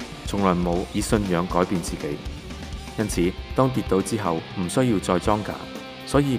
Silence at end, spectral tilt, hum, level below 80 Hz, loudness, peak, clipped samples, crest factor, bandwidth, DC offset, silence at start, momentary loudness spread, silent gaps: 0 s; -6 dB/octave; none; -38 dBFS; -24 LUFS; -4 dBFS; under 0.1%; 20 dB; 16 kHz; under 0.1%; 0 s; 12 LU; none